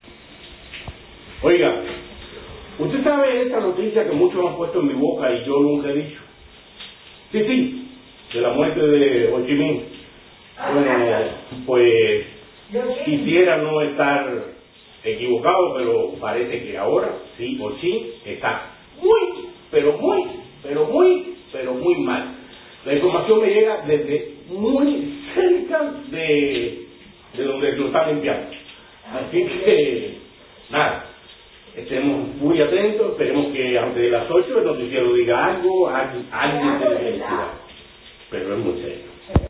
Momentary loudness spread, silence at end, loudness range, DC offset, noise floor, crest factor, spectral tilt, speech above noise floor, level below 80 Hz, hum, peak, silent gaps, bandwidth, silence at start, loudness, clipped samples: 18 LU; 0 s; 4 LU; under 0.1%; -47 dBFS; 18 dB; -10 dB/octave; 28 dB; -46 dBFS; none; -4 dBFS; none; 4 kHz; 0.1 s; -20 LUFS; under 0.1%